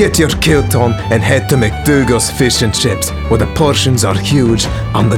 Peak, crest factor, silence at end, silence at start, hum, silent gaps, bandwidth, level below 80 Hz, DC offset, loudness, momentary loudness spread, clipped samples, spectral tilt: 0 dBFS; 12 dB; 0 s; 0 s; none; none; 17.5 kHz; -24 dBFS; under 0.1%; -12 LUFS; 4 LU; 0.1%; -4.5 dB/octave